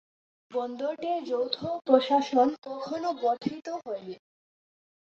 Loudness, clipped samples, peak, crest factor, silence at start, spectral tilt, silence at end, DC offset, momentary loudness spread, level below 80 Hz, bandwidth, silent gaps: -29 LUFS; under 0.1%; -8 dBFS; 22 dB; 0.5 s; -5.5 dB/octave; 0.9 s; under 0.1%; 14 LU; -74 dBFS; 7.4 kHz; none